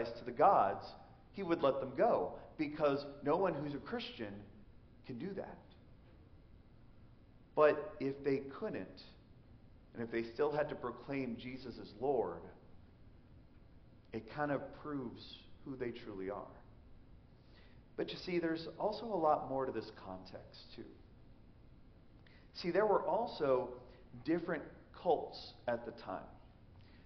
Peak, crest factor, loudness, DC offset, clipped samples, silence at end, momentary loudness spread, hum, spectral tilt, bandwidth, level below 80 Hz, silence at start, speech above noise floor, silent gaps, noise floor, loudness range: -18 dBFS; 22 dB; -38 LUFS; under 0.1%; under 0.1%; 0.05 s; 21 LU; none; -4.5 dB/octave; 6.2 kHz; -64 dBFS; 0 s; 23 dB; none; -61 dBFS; 9 LU